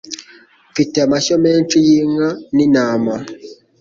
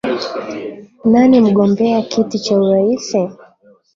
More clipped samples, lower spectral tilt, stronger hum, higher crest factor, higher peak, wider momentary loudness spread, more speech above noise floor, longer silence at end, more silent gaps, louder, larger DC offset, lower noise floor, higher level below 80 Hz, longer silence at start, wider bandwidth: neither; second, -5 dB/octave vs -6.5 dB/octave; neither; about the same, 14 dB vs 12 dB; about the same, -2 dBFS vs -2 dBFS; about the same, 17 LU vs 15 LU; about the same, 32 dB vs 35 dB; second, 0.3 s vs 0.6 s; neither; about the same, -14 LUFS vs -14 LUFS; neither; about the same, -46 dBFS vs -49 dBFS; about the same, -54 dBFS vs -54 dBFS; about the same, 0.05 s vs 0.05 s; about the same, 7.6 kHz vs 7.6 kHz